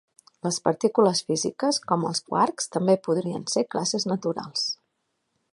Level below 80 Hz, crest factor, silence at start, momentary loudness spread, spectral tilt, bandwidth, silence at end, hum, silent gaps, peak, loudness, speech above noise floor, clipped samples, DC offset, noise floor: -72 dBFS; 22 dB; 0.45 s; 7 LU; -4 dB/octave; 11.5 kHz; 0.8 s; none; none; -4 dBFS; -25 LUFS; 52 dB; under 0.1%; under 0.1%; -76 dBFS